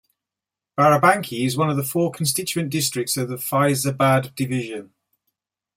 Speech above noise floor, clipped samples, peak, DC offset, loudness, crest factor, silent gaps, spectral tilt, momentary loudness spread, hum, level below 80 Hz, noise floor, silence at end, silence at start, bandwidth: 67 dB; under 0.1%; -2 dBFS; under 0.1%; -20 LUFS; 20 dB; none; -4.5 dB/octave; 9 LU; none; -62 dBFS; -88 dBFS; 0.9 s; 0.75 s; 16.5 kHz